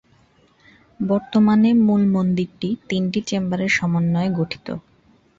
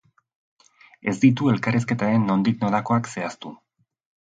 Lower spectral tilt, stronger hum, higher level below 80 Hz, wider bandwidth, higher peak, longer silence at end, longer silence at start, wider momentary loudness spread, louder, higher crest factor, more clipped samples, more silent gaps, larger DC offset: about the same, -6.5 dB/octave vs -7 dB/octave; neither; about the same, -56 dBFS vs -60 dBFS; second, 7.6 kHz vs 9.2 kHz; about the same, -6 dBFS vs -4 dBFS; about the same, 0.6 s vs 0.7 s; about the same, 1 s vs 1.05 s; about the same, 12 LU vs 12 LU; about the same, -20 LUFS vs -22 LUFS; about the same, 14 dB vs 18 dB; neither; neither; neither